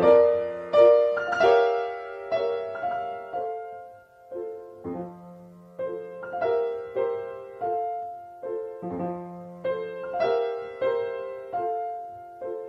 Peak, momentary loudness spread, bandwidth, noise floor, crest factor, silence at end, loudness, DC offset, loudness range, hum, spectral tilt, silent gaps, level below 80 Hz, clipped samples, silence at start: -6 dBFS; 18 LU; 6.6 kHz; -48 dBFS; 20 dB; 0 s; -26 LUFS; under 0.1%; 11 LU; none; -6.5 dB/octave; none; -66 dBFS; under 0.1%; 0 s